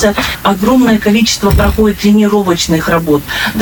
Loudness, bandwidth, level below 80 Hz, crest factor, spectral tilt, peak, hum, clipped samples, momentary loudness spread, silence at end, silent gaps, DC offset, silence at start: -10 LUFS; 19.5 kHz; -22 dBFS; 10 dB; -5 dB/octave; 0 dBFS; none; under 0.1%; 4 LU; 0 s; none; under 0.1%; 0 s